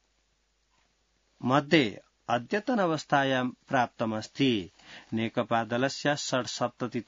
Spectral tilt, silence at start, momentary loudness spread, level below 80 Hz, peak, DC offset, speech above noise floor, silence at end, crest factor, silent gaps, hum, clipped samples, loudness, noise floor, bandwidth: -5 dB/octave; 1.4 s; 8 LU; -70 dBFS; -8 dBFS; under 0.1%; 44 dB; 0.05 s; 22 dB; none; none; under 0.1%; -28 LUFS; -72 dBFS; 7.8 kHz